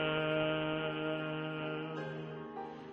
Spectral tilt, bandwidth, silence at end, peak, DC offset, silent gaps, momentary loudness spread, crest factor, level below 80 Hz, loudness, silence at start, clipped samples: -7.5 dB/octave; 6.6 kHz; 0 s; -22 dBFS; under 0.1%; none; 11 LU; 14 dB; -68 dBFS; -37 LUFS; 0 s; under 0.1%